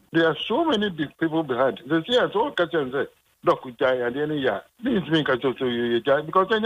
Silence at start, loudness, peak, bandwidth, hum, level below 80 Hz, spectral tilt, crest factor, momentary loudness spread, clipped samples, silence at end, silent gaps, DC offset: 0.15 s; -24 LUFS; -8 dBFS; 11 kHz; none; -60 dBFS; -6.5 dB/octave; 14 dB; 6 LU; under 0.1%; 0 s; none; under 0.1%